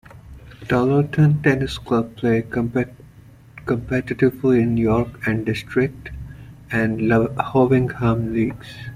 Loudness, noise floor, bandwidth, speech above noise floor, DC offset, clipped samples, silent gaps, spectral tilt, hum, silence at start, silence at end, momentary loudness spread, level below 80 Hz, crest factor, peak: -20 LUFS; -46 dBFS; 15.5 kHz; 26 dB; under 0.1%; under 0.1%; none; -8 dB/octave; none; 0.15 s; 0 s; 10 LU; -42 dBFS; 16 dB; -4 dBFS